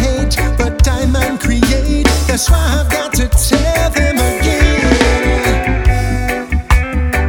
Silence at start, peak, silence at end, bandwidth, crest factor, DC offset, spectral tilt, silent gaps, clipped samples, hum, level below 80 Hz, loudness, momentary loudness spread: 0 s; 0 dBFS; 0 s; 19 kHz; 12 dB; under 0.1%; -5 dB/octave; none; under 0.1%; none; -14 dBFS; -13 LUFS; 4 LU